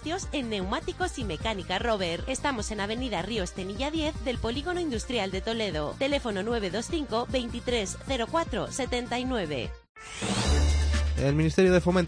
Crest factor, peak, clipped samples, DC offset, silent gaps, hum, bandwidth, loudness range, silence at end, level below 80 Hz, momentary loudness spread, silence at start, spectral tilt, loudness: 18 dB; -10 dBFS; under 0.1%; under 0.1%; 9.89-9.95 s; none; 10.5 kHz; 2 LU; 0 s; -36 dBFS; 7 LU; 0 s; -5 dB/octave; -29 LUFS